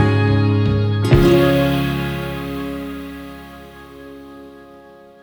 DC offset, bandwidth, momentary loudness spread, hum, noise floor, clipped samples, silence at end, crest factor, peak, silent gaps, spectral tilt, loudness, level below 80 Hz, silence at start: under 0.1%; over 20 kHz; 25 LU; none; -43 dBFS; under 0.1%; 0.55 s; 16 dB; -2 dBFS; none; -7.5 dB/octave; -17 LUFS; -32 dBFS; 0 s